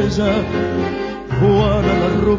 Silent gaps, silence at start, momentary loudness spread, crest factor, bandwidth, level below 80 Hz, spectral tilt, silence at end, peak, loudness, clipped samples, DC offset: none; 0 s; 8 LU; 12 dB; 7.6 kHz; -30 dBFS; -7.5 dB/octave; 0 s; -4 dBFS; -17 LUFS; under 0.1%; under 0.1%